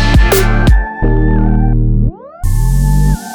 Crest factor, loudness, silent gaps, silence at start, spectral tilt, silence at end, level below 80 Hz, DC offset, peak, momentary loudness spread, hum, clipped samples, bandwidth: 10 dB; -13 LUFS; none; 0 s; -6 dB/octave; 0 s; -12 dBFS; under 0.1%; 0 dBFS; 6 LU; none; under 0.1%; over 20 kHz